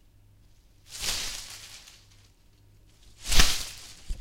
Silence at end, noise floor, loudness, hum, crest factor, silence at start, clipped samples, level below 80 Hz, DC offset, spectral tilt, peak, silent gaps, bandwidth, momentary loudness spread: 0 s; -58 dBFS; -28 LUFS; none; 28 dB; 0.9 s; under 0.1%; -34 dBFS; under 0.1%; -1 dB/octave; 0 dBFS; none; 16 kHz; 22 LU